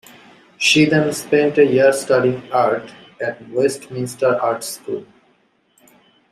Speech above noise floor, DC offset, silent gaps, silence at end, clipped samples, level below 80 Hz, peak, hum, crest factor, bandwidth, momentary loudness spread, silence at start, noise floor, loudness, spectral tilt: 43 dB; under 0.1%; none; 1.3 s; under 0.1%; -60 dBFS; -2 dBFS; none; 16 dB; 15.5 kHz; 13 LU; 0.6 s; -60 dBFS; -17 LUFS; -4.5 dB/octave